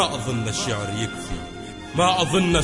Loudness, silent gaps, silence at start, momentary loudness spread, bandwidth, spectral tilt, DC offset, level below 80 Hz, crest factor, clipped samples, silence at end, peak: -23 LUFS; none; 0 s; 14 LU; 11.5 kHz; -4 dB/octave; under 0.1%; -40 dBFS; 18 dB; under 0.1%; 0 s; -4 dBFS